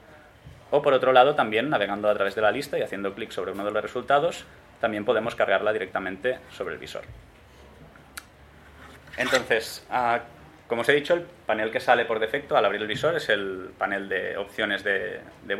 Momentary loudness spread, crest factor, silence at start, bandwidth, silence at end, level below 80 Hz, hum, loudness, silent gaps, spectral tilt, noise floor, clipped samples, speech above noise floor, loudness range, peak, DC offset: 12 LU; 22 dB; 0.1 s; 15.5 kHz; 0 s; -60 dBFS; none; -25 LUFS; none; -4 dB/octave; -51 dBFS; under 0.1%; 26 dB; 7 LU; -4 dBFS; under 0.1%